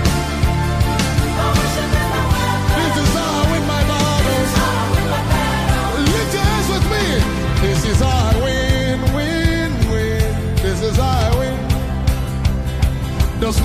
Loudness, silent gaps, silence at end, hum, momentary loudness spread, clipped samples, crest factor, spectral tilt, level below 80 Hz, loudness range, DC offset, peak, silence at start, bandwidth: -17 LUFS; none; 0 s; none; 4 LU; under 0.1%; 12 dB; -5 dB/octave; -22 dBFS; 2 LU; under 0.1%; -4 dBFS; 0 s; 15.5 kHz